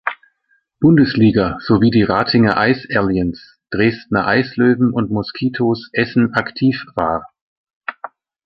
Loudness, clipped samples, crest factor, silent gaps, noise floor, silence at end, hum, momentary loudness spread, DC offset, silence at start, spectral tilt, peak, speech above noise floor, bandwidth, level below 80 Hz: -16 LUFS; under 0.1%; 14 dB; 7.41-7.65 s, 7.76-7.81 s; -63 dBFS; 0.4 s; none; 15 LU; under 0.1%; 0.05 s; -9 dB/octave; -2 dBFS; 48 dB; 5.8 kHz; -44 dBFS